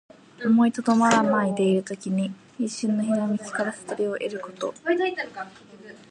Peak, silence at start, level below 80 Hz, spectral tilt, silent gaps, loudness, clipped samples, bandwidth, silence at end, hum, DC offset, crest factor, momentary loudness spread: -6 dBFS; 0.4 s; -72 dBFS; -5.5 dB/octave; none; -24 LUFS; under 0.1%; 10.5 kHz; 0.15 s; none; under 0.1%; 18 dB; 12 LU